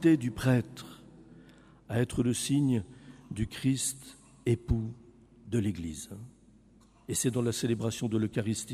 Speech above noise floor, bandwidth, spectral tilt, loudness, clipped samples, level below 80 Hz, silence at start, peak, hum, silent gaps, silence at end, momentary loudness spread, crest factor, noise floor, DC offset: 30 dB; 15.5 kHz; -5.5 dB/octave; -31 LUFS; under 0.1%; -50 dBFS; 0 s; -14 dBFS; none; none; 0 s; 20 LU; 18 dB; -60 dBFS; under 0.1%